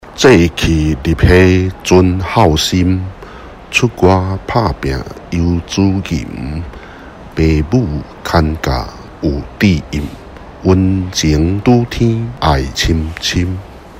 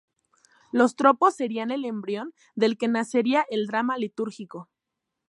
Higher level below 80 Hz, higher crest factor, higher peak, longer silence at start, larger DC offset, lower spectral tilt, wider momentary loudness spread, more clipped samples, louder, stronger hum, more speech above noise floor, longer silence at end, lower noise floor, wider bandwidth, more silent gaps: first, -24 dBFS vs -80 dBFS; second, 14 dB vs 22 dB; first, 0 dBFS vs -4 dBFS; second, 0.05 s vs 0.75 s; neither; about the same, -6 dB/octave vs -5 dB/octave; about the same, 16 LU vs 14 LU; first, 0.3% vs under 0.1%; first, -13 LUFS vs -25 LUFS; neither; second, 20 dB vs 59 dB; second, 0 s vs 0.65 s; second, -32 dBFS vs -84 dBFS; first, 16 kHz vs 11.5 kHz; neither